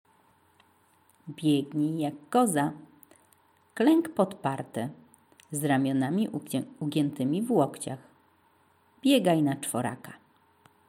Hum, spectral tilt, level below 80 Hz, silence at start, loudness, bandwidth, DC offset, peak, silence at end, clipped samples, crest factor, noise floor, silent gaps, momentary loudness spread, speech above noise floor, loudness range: none; -5.5 dB/octave; -78 dBFS; 1.25 s; -28 LUFS; 16.5 kHz; under 0.1%; -10 dBFS; 0.75 s; under 0.1%; 20 dB; -65 dBFS; none; 15 LU; 38 dB; 2 LU